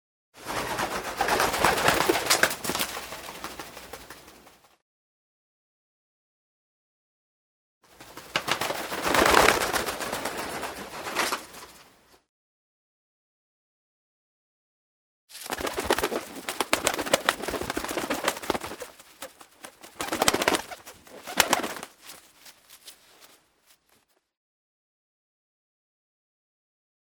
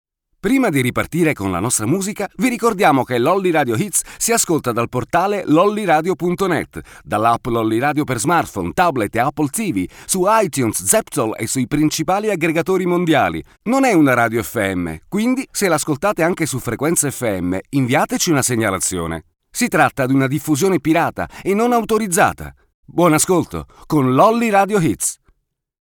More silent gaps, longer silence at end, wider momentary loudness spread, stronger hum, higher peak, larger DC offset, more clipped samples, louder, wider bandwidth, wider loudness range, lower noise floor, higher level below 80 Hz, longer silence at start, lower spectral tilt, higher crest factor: first, 4.82-7.81 s, 12.29-15.28 s vs 22.74-22.83 s; first, 3.8 s vs 0.7 s; first, 23 LU vs 7 LU; neither; about the same, 0 dBFS vs 0 dBFS; neither; neither; second, -26 LUFS vs -17 LUFS; about the same, over 20 kHz vs 19.5 kHz; first, 13 LU vs 2 LU; first, -67 dBFS vs -62 dBFS; second, -54 dBFS vs -46 dBFS; about the same, 0.35 s vs 0.45 s; second, -2 dB/octave vs -4.5 dB/octave; first, 30 dB vs 18 dB